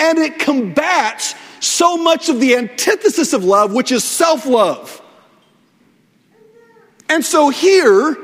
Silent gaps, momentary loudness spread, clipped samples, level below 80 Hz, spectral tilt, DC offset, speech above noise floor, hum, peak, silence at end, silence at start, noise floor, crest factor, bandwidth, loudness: none; 8 LU; under 0.1%; -64 dBFS; -2.5 dB/octave; under 0.1%; 41 dB; none; 0 dBFS; 0 s; 0 s; -54 dBFS; 14 dB; 16 kHz; -14 LUFS